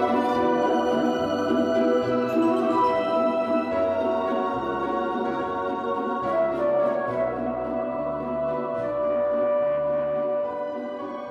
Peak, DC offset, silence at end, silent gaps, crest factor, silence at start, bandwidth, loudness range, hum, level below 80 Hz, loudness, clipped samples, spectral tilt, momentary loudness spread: -10 dBFS; under 0.1%; 0 s; none; 14 dB; 0 s; 9.4 kHz; 3 LU; none; -56 dBFS; -25 LUFS; under 0.1%; -6.5 dB/octave; 6 LU